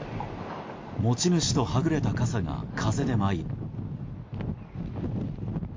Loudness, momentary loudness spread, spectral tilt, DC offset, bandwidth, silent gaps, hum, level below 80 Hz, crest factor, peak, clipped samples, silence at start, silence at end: -29 LUFS; 13 LU; -5.5 dB/octave; under 0.1%; 7.6 kHz; none; none; -44 dBFS; 16 dB; -12 dBFS; under 0.1%; 0 s; 0 s